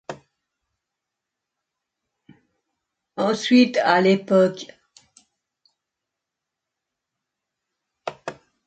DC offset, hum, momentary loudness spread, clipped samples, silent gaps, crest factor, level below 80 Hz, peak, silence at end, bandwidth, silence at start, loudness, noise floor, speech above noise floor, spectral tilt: under 0.1%; none; 22 LU; under 0.1%; none; 22 dB; -72 dBFS; -4 dBFS; 0.35 s; 8.6 kHz; 0.1 s; -19 LUFS; -84 dBFS; 66 dB; -5.5 dB/octave